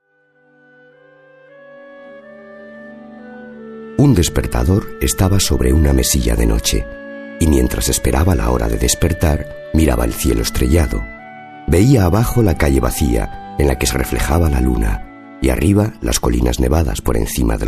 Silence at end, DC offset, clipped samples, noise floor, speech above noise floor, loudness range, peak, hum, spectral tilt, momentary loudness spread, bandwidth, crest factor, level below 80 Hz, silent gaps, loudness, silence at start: 0 s; under 0.1%; under 0.1%; -56 dBFS; 42 dB; 3 LU; 0 dBFS; none; -5.5 dB/octave; 20 LU; 14 kHz; 16 dB; -22 dBFS; none; -16 LUFS; 1.8 s